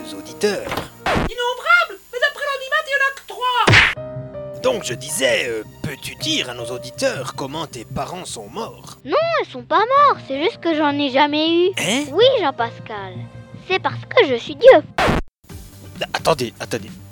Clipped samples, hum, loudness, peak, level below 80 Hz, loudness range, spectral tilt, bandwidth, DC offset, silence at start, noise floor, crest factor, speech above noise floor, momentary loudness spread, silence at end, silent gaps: under 0.1%; none; -18 LUFS; 0 dBFS; -42 dBFS; 7 LU; -4 dB/octave; 19 kHz; under 0.1%; 0 s; -39 dBFS; 20 dB; 20 dB; 17 LU; 0 s; none